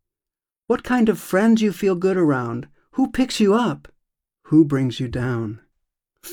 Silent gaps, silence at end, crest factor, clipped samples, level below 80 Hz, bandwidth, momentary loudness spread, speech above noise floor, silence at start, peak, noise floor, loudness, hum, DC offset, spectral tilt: none; 0 s; 16 dB; under 0.1%; -48 dBFS; 19.5 kHz; 13 LU; 71 dB; 0.7 s; -4 dBFS; -90 dBFS; -20 LUFS; none; under 0.1%; -6.5 dB/octave